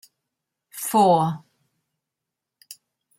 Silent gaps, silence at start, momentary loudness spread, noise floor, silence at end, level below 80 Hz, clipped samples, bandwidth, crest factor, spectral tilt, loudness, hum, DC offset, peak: none; 0.75 s; 20 LU; -85 dBFS; 0.45 s; -72 dBFS; under 0.1%; 16.5 kHz; 20 dB; -5.5 dB/octave; -20 LUFS; none; under 0.1%; -6 dBFS